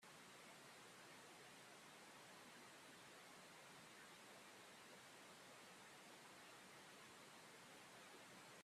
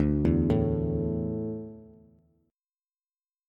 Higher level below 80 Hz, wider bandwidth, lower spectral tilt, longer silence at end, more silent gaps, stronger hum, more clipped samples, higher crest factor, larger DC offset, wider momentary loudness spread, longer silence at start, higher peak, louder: second, under -90 dBFS vs -40 dBFS; first, 15 kHz vs 5.2 kHz; second, -2 dB/octave vs -11 dB/octave; second, 0 s vs 1.6 s; neither; neither; neither; about the same, 14 dB vs 18 dB; neither; second, 0 LU vs 13 LU; about the same, 0 s vs 0 s; second, -50 dBFS vs -12 dBFS; second, -62 LUFS vs -28 LUFS